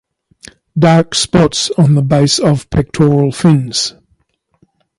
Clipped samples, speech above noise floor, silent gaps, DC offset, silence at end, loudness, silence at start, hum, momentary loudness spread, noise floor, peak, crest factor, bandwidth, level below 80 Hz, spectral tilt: under 0.1%; 49 dB; none; under 0.1%; 1.1 s; -12 LUFS; 0.75 s; none; 7 LU; -59 dBFS; 0 dBFS; 12 dB; 11.5 kHz; -38 dBFS; -5.5 dB/octave